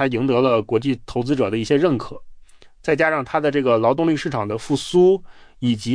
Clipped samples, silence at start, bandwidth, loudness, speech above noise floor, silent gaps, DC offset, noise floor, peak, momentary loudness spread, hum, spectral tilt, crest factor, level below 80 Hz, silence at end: under 0.1%; 0 s; 10.5 kHz; -20 LUFS; 26 dB; none; under 0.1%; -45 dBFS; -4 dBFS; 8 LU; none; -6.5 dB/octave; 14 dB; -48 dBFS; 0 s